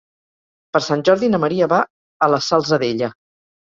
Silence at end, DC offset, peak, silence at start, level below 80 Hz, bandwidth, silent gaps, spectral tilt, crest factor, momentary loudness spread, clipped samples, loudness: 0.55 s; under 0.1%; -2 dBFS; 0.75 s; -60 dBFS; 7.6 kHz; 1.90-2.20 s; -5.5 dB/octave; 18 dB; 7 LU; under 0.1%; -18 LUFS